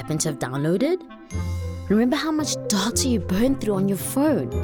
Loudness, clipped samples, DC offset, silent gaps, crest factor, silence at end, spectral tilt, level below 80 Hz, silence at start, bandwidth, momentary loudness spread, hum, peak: -23 LUFS; under 0.1%; under 0.1%; none; 16 dB; 0 s; -5 dB/octave; -42 dBFS; 0 s; over 20 kHz; 8 LU; none; -8 dBFS